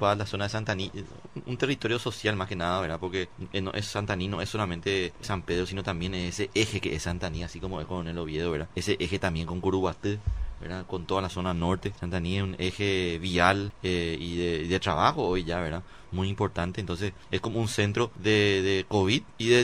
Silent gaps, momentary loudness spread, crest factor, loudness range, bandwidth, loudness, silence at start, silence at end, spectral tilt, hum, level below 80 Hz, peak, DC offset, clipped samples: none; 10 LU; 24 dB; 4 LU; 13.5 kHz; -29 LUFS; 0 s; 0 s; -5 dB/octave; none; -44 dBFS; -4 dBFS; 0.3%; under 0.1%